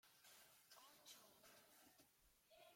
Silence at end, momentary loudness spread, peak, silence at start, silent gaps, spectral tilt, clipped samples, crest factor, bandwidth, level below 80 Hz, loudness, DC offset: 0 s; 5 LU; -50 dBFS; 0.05 s; none; -1 dB/octave; under 0.1%; 20 dB; 16.5 kHz; under -90 dBFS; -67 LUFS; under 0.1%